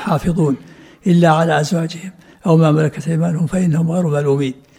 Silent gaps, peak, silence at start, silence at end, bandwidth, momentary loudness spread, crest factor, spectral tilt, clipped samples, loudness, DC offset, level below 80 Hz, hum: none; 0 dBFS; 0 s; 0.25 s; 11 kHz; 12 LU; 16 dB; -7.5 dB/octave; under 0.1%; -16 LUFS; under 0.1%; -44 dBFS; none